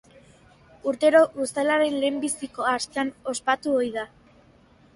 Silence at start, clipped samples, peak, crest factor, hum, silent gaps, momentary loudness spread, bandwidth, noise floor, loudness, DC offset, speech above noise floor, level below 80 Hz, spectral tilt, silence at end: 0.85 s; under 0.1%; -6 dBFS; 20 dB; none; none; 11 LU; 11.5 kHz; -56 dBFS; -24 LUFS; under 0.1%; 32 dB; -64 dBFS; -2.5 dB/octave; 0.9 s